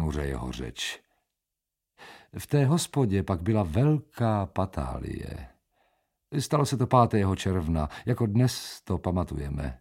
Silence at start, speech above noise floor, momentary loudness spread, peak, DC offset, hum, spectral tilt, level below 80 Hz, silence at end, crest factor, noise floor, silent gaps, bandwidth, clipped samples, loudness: 0 s; 60 dB; 12 LU; -6 dBFS; under 0.1%; none; -6.5 dB/octave; -42 dBFS; 0.05 s; 22 dB; -87 dBFS; none; 16.5 kHz; under 0.1%; -27 LUFS